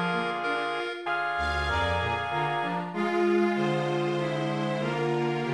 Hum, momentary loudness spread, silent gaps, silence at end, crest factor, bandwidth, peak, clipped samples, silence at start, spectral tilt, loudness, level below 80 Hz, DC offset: none; 5 LU; none; 0 s; 14 dB; 11 kHz; -14 dBFS; under 0.1%; 0 s; -6.5 dB/octave; -28 LUFS; -46 dBFS; under 0.1%